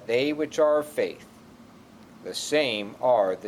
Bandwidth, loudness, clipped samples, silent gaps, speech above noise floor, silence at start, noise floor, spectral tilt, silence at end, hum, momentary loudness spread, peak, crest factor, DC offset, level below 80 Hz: 15.5 kHz; -25 LUFS; under 0.1%; none; 25 dB; 0 s; -50 dBFS; -3.5 dB/octave; 0 s; none; 12 LU; -10 dBFS; 16 dB; under 0.1%; -68 dBFS